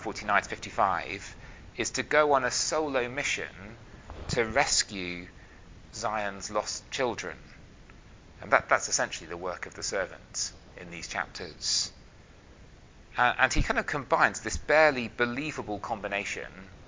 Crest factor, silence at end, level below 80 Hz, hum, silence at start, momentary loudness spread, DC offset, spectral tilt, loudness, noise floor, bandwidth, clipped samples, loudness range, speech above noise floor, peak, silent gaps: 26 dB; 0 s; -46 dBFS; none; 0 s; 18 LU; under 0.1%; -2.5 dB/octave; -28 LUFS; -53 dBFS; 7.8 kHz; under 0.1%; 7 LU; 23 dB; -4 dBFS; none